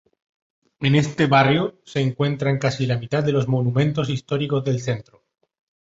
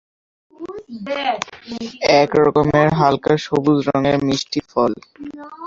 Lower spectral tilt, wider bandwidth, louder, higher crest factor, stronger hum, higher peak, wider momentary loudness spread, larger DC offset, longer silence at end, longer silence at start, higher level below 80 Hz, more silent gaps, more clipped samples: about the same, -6.5 dB/octave vs -6 dB/octave; about the same, 7.8 kHz vs 7.6 kHz; second, -21 LUFS vs -17 LUFS; about the same, 18 dB vs 18 dB; neither; about the same, -2 dBFS vs 0 dBFS; second, 8 LU vs 19 LU; neither; first, 0.85 s vs 0 s; first, 0.8 s vs 0.6 s; about the same, -54 dBFS vs -50 dBFS; neither; neither